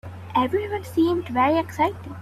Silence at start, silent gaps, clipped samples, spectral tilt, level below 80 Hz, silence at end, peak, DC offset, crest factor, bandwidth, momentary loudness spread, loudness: 0.05 s; none; under 0.1%; -6.5 dB/octave; -56 dBFS; 0 s; -8 dBFS; under 0.1%; 14 dB; 14 kHz; 6 LU; -23 LUFS